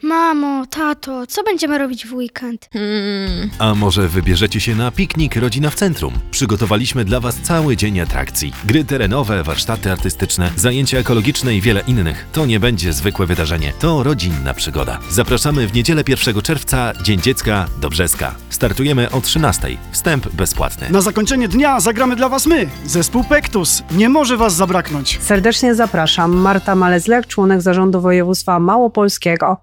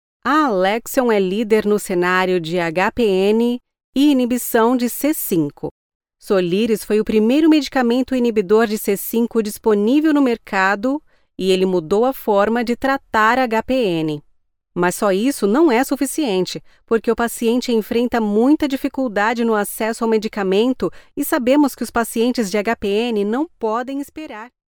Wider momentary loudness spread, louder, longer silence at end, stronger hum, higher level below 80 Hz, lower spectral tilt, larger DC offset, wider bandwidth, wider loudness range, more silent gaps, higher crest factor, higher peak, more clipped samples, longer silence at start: about the same, 6 LU vs 7 LU; first, -15 LUFS vs -18 LUFS; second, 0.05 s vs 0.25 s; neither; first, -28 dBFS vs -50 dBFS; about the same, -4.5 dB/octave vs -5 dB/octave; neither; about the same, over 20 kHz vs over 20 kHz; about the same, 4 LU vs 2 LU; second, none vs 3.84-3.93 s, 5.71-6.00 s; about the same, 14 dB vs 16 dB; about the same, 0 dBFS vs -2 dBFS; neither; second, 0.05 s vs 0.25 s